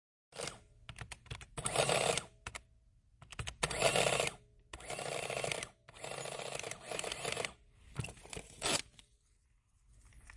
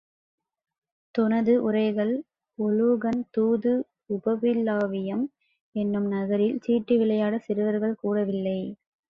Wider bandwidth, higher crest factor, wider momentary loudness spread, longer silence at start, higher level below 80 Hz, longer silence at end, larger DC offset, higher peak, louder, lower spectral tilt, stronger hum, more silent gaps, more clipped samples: first, 11.5 kHz vs 5.4 kHz; first, 26 dB vs 14 dB; first, 20 LU vs 9 LU; second, 0.3 s vs 1.15 s; first, -60 dBFS vs -68 dBFS; second, 0 s vs 0.35 s; neither; about the same, -14 dBFS vs -12 dBFS; second, -37 LUFS vs -26 LUFS; second, -2 dB/octave vs -9.5 dB/octave; neither; second, none vs 5.61-5.72 s; neither